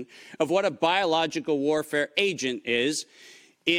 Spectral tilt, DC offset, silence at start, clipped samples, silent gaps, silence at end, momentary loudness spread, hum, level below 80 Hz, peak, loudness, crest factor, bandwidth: -3.5 dB/octave; under 0.1%; 0 s; under 0.1%; none; 0 s; 7 LU; none; -70 dBFS; -8 dBFS; -25 LUFS; 18 dB; 16.5 kHz